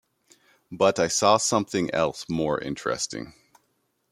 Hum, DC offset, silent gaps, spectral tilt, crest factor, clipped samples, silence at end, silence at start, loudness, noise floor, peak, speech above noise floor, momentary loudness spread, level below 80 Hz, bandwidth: none; under 0.1%; none; -3.5 dB/octave; 22 dB; under 0.1%; 0.8 s; 0.7 s; -24 LUFS; -72 dBFS; -4 dBFS; 48 dB; 12 LU; -60 dBFS; 15.5 kHz